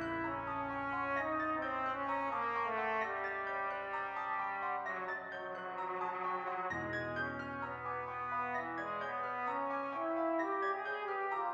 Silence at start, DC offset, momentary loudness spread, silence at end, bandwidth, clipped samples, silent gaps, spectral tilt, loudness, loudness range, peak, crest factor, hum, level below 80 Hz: 0 s; under 0.1%; 5 LU; 0 s; 8.2 kHz; under 0.1%; none; -6.5 dB/octave; -38 LUFS; 3 LU; -24 dBFS; 14 dB; none; -68 dBFS